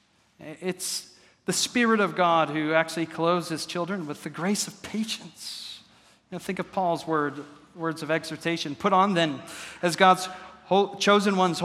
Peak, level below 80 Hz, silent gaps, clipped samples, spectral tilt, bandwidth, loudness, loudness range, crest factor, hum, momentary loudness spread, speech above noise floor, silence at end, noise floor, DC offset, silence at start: -4 dBFS; -70 dBFS; none; under 0.1%; -4 dB/octave; 16 kHz; -25 LUFS; 7 LU; 24 dB; none; 16 LU; 32 dB; 0 s; -57 dBFS; under 0.1%; 0.4 s